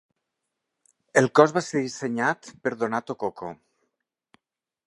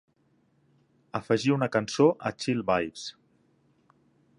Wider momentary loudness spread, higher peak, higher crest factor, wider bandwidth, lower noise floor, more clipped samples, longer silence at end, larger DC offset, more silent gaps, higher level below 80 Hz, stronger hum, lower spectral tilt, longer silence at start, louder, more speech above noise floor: about the same, 13 LU vs 13 LU; first, -2 dBFS vs -8 dBFS; about the same, 26 dB vs 22 dB; about the same, 11.5 kHz vs 11 kHz; first, -82 dBFS vs -68 dBFS; neither; about the same, 1.35 s vs 1.25 s; neither; neither; second, -72 dBFS vs -64 dBFS; neither; about the same, -5 dB/octave vs -5.5 dB/octave; about the same, 1.15 s vs 1.15 s; first, -24 LUFS vs -27 LUFS; first, 58 dB vs 42 dB